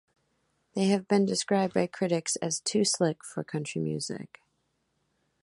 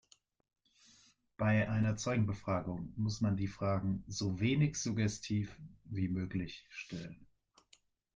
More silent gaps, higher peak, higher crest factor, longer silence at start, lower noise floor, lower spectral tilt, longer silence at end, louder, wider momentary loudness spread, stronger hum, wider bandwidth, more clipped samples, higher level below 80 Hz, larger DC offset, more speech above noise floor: neither; first, -10 dBFS vs -20 dBFS; about the same, 20 dB vs 16 dB; second, 0.75 s vs 1.4 s; first, -76 dBFS vs -70 dBFS; second, -4.5 dB/octave vs -6 dB/octave; first, 1.15 s vs 0.9 s; first, -29 LUFS vs -36 LUFS; about the same, 11 LU vs 13 LU; neither; first, 11.5 kHz vs 9.4 kHz; neither; second, -70 dBFS vs -62 dBFS; neither; first, 47 dB vs 35 dB